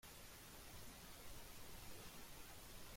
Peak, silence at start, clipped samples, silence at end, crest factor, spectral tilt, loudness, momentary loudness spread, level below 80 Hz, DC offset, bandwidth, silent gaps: -42 dBFS; 0.05 s; under 0.1%; 0 s; 14 dB; -2.5 dB/octave; -57 LUFS; 1 LU; -64 dBFS; under 0.1%; 16.5 kHz; none